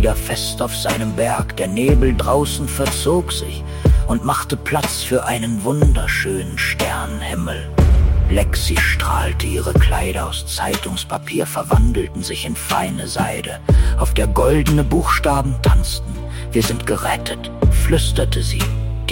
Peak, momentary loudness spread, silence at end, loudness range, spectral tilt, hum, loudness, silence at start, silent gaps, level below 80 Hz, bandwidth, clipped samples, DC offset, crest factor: -4 dBFS; 7 LU; 0 s; 2 LU; -5 dB/octave; none; -18 LUFS; 0 s; none; -20 dBFS; 17 kHz; under 0.1%; under 0.1%; 14 dB